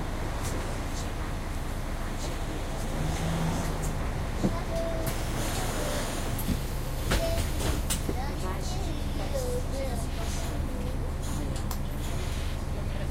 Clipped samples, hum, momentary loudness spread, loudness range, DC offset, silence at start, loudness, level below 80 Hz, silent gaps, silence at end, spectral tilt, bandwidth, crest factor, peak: under 0.1%; none; 5 LU; 3 LU; under 0.1%; 0 s; -32 LUFS; -32 dBFS; none; 0 s; -5 dB/octave; 16 kHz; 18 dB; -12 dBFS